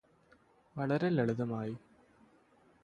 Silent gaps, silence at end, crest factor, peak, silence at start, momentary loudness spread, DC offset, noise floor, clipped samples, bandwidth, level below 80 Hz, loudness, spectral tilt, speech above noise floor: none; 1.05 s; 20 dB; -18 dBFS; 0.75 s; 16 LU; under 0.1%; -66 dBFS; under 0.1%; 10.5 kHz; -72 dBFS; -34 LUFS; -8.5 dB/octave; 33 dB